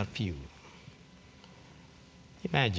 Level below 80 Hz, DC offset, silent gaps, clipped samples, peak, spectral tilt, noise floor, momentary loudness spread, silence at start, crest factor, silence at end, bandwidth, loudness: -52 dBFS; under 0.1%; none; under 0.1%; -10 dBFS; -6 dB/octave; -56 dBFS; 22 LU; 0 s; 26 dB; 0 s; 8 kHz; -35 LUFS